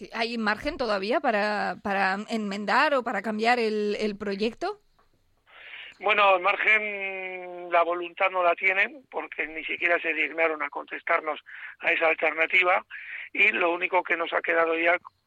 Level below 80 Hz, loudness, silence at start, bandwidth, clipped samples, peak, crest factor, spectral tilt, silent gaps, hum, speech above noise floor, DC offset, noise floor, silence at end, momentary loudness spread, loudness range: -60 dBFS; -25 LUFS; 0 s; 12.5 kHz; under 0.1%; -8 dBFS; 18 dB; -4.5 dB/octave; none; none; 39 dB; under 0.1%; -65 dBFS; 0.2 s; 13 LU; 3 LU